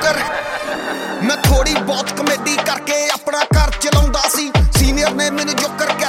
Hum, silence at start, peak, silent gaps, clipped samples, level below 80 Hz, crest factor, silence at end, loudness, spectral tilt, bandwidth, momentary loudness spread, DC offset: none; 0 s; 0 dBFS; none; under 0.1%; -22 dBFS; 14 dB; 0 s; -16 LUFS; -3.5 dB/octave; 16.5 kHz; 7 LU; under 0.1%